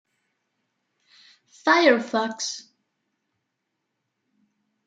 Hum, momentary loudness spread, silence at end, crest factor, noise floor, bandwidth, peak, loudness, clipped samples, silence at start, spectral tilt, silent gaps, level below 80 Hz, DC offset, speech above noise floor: none; 13 LU; 2.25 s; 24 dB; -79 dBFS; 9.4 kHz; -4 dBFS; -21 LUFS; under 0.1%; 1.65 s; -2.5 dB/octave; none; -88 dBFS; under 0.1%; 58 dB